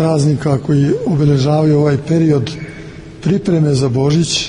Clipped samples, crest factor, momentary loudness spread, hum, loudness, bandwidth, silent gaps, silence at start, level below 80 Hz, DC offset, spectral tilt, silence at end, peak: under 0.1%; 10 dB; 11 LU; none; -14 LUFS; 10.5 kHz; none; 0 s; -40 dBFS; under 0.1%; -6.5 dB/octave; 0 s; -2 dBFS